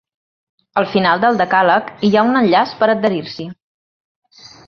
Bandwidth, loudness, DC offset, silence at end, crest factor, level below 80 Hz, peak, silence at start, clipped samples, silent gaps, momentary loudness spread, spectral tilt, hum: 6.8 kHz; -15 LUFS; under 0.1%; 1.15 s; 16 dB; -58 dBFS; -2 dBFS; 0.75 s; under 0.1%; none; 11 LU; -6.5 dB/octave; none